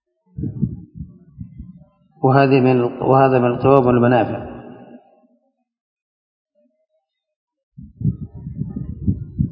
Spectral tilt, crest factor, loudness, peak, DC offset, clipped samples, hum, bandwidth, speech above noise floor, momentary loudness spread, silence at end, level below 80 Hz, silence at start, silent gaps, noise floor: -11.5 dB/octave; 20 dB; -17 LUFS; 0 dBFS; under 0.1%; under 0.1%; none; 5.2 kHz; 58 dB; 24 LU; 0 s; -40 dBFS; 0.35 s; 5.80-5.96 s, 6.02-6.45 s, 7.36-7.47 s, 7.63-7.72 s; -72 dBFS